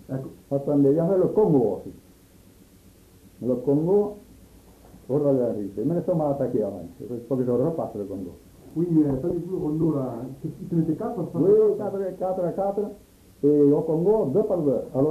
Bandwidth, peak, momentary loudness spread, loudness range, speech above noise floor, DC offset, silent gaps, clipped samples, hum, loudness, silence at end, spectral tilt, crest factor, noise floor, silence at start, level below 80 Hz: 14 kHz; -8 dBFS; 14 LU; 4 LU; 30 dB; under 0.1%; none; under 0.1%; none; -24 LUFS; 0 s; -10.5 dB/octave; 16 dB; -53 dBFS; 0.1 s; -54 dBFS